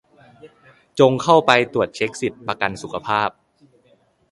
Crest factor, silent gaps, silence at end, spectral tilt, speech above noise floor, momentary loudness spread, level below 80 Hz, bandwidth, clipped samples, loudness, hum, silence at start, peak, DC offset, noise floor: 20 dB; none; 1 s; -5 dB/octave; 40 dB; 12 LU; -58 dBFS; 11.5 kHz; under 0.1%; -19 LUFS; none; 0.45 s; 0 dBFS; under 0.1%; -59 dBFS